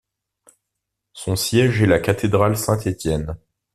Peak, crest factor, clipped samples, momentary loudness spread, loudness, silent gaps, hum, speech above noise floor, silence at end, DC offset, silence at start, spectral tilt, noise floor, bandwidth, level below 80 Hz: -2 dBFS; 18 dB; under 0.1%; 13 LU; -19 LUFS; none; none; 62 dB; 0.4 s; under 0.1%; 1.15 s; -5.5 dB/octave; -80 dBFS; 14.5 kHz; -42 dBFS